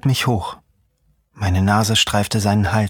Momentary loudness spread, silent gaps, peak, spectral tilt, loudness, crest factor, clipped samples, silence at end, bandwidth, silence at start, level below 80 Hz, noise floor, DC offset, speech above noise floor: 9 LU; none; -2 dBFS; -4.5 dB/octave; -18 LUFS; 16 dB; under 0.1%; 0 s; 18.5 kHz; 0.05 s; -42 dBFS; -62 dBFS; under 0.1%; 45 dB